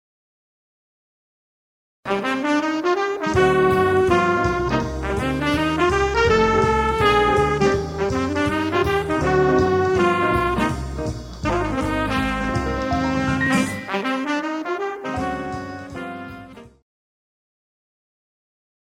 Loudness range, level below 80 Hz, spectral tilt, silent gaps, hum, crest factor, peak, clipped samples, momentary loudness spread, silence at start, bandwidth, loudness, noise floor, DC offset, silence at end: 10 LU; -36 dBFS; -6 dB/octave; none; none; 16 dB; -6 dBFS; under 0.1%; 11 LU; 2.05 s; 16 kHz; -20 LUFS; -40 dBFS; under 0.1%; 2.15 s